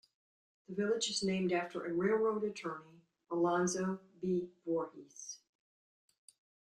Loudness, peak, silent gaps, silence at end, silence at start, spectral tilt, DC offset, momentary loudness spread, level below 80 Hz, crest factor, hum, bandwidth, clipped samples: -36 LUFS; -20 dBFS; none; 1.45 s; 0.7 s; -4.5 dB/octave; under 0.1%; 16 LU; -76 dBFS; 18 dB; none; 11.5 kHz; under 0.1%